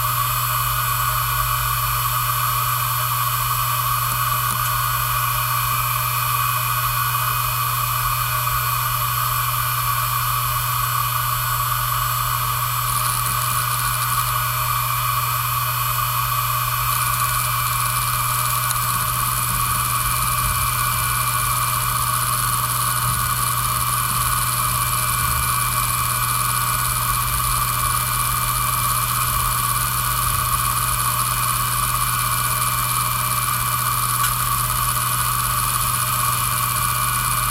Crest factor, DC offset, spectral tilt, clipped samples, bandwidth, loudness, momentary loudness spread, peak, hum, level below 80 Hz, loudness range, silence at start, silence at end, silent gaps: 16 dB; under 0.1%; -2 dB/octave; under 0.1%; 17 kHz; -19 LUFS; 1 LU; -4 dBFS; none; -36 dBFS; 1 LU; 0 s; 0 s; none